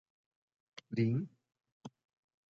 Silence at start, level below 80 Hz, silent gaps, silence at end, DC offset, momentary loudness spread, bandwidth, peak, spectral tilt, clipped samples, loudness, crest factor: 0.9 s; -78 dBFS; 1.72-1.81 s; 0.65 s; under 0.1%; 22 LU; 7 kHz; -22 dBFS; -8 dB/octave; under 0.1%; -36 LUFS; 20 dB